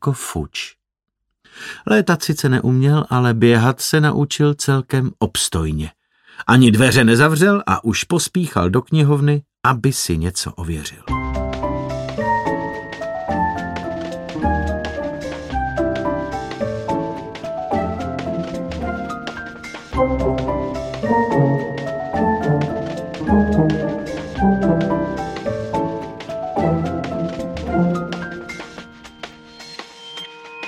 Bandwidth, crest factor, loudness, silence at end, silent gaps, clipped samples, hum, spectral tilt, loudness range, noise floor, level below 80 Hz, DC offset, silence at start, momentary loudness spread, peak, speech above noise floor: 15.5 kHz; 18 dB; -19 LUFS; 0 s; none; under 0.1%; none; -5.5 dB/octave; 8 LU; -39 dBFS; -36 dBFS; under 0.1%; 0 s; 14 LU; -2 dBFS; 23 dB